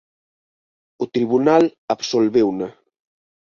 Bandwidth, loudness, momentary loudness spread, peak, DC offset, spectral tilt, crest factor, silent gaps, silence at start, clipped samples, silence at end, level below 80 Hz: 7.4 kHz; -18 LUFS; 13 LU; -2 dBFS; under 0.1%; -5.5 dB/octave; 18 dB; 1.78-1.88 s; 1 s; under 0.1%; 0.75 s; -62 dBFS